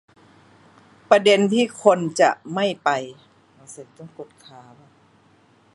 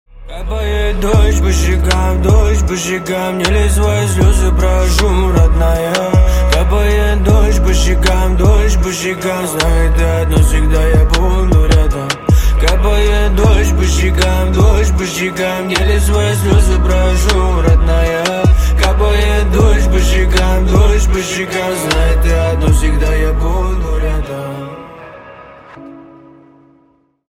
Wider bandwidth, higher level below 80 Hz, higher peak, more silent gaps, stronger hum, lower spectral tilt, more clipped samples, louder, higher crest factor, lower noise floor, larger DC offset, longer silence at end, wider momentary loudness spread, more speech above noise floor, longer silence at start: second, 11.5 kHz vs 15.5 kHz; second, -70 dBFS vs -12 dBFS; about the same, 0 dBFS vs 0 dBFS; neither; neither; about the same, -4.5 dB/octave vs -5.5 dB/octave; neither; second, -19 LUFS vs -13 LUFS; first, 22 dB vs 10 dB; about the same, -56 dBFS vs -53 dBFS; neither; first, 1.5 s vs 1.3 s; first, 25 LU vs 6 LU; second, 36 dB vs 43 dB; first, 1.1 s vs 0.15 s